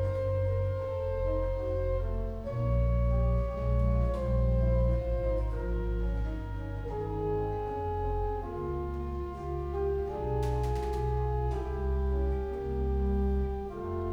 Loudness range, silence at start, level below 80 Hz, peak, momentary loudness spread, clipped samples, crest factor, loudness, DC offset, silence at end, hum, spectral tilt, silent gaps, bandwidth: 4 LU; 0 s; -32 dBFS; -18 dBFS; 7 LU; under 0.1%; 12 dB; -32 LUFS; under 0.1%; 0 s; none; -9.5 dB/octave; none; 6 kHz